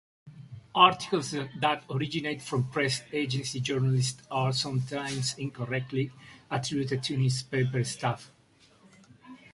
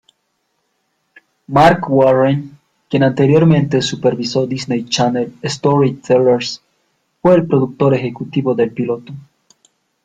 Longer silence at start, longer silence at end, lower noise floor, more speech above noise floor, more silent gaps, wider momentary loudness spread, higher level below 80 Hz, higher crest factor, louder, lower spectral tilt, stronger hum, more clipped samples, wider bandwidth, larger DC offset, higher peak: second, 0.25 s vs 1.5 s; second, 0.15 s vs 0.85 s; second, -60 dBFS vs -67 dBFS; second, 31 dB vs 54 dB; neither; second, 7 LU vs 11 LU; second, -64 dBFS vs -50 dBFS; first, 24 dB vs 16 dB; second, -29 LUFS vs -15 LUFS; second, -4.5 dB/octave vs -6.5 dB/octave; neither; neither; first, 11.5 kHz vs 9.4 kHz; neither; second, -6 dBFS vs 0 dBFS